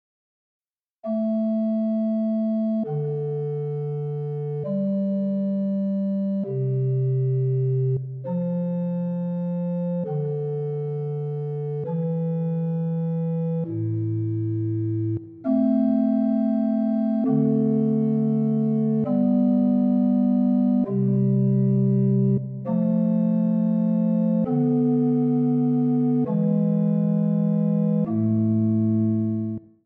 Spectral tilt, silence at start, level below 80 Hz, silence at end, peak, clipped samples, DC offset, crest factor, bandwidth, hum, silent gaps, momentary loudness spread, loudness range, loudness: -13.5 dB/octave; 1.05 s; -70 dBFS; 0.25 s; -10 dBFS; under 0.1%; under 0.1%; 12 dB; 3.1 kHz; none; none; 7 LU; 6 LU; -23 LUFS